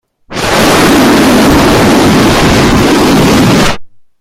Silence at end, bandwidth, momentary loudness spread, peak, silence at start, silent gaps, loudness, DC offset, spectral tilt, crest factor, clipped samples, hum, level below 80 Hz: 0.35 s; 16.5 kHz; 6 LU; 0 dBFS; 0.3 s; none; -6 LUFS; under 0.1%; -4.5 dB/octave; 6 dB; under 0.1%; none; -22 dBFS